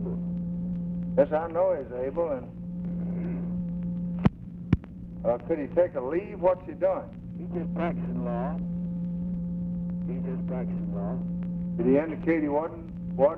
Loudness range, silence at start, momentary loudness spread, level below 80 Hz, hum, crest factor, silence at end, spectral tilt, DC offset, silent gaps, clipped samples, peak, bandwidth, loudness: 3 LU; 0 s; 8 LU; -46 dBFS; none; 20 dB; 0 s; -11.5 dB/octave; under 0.1%; none; under 0.1%; -8 dBFS; 3.7 kHz; -29 LUFS